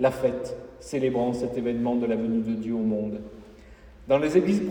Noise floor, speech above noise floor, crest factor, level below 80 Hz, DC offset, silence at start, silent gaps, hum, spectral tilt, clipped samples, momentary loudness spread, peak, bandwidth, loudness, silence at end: -48 dBFS; 23 dB; 18 dB; -52 dBFS; under 0.1%; 0 s; none; none; -7 dB/octave; under 0.1%; 12 LU; -8 dBFS; 18.5 kHz; -26 LUFS; 0 s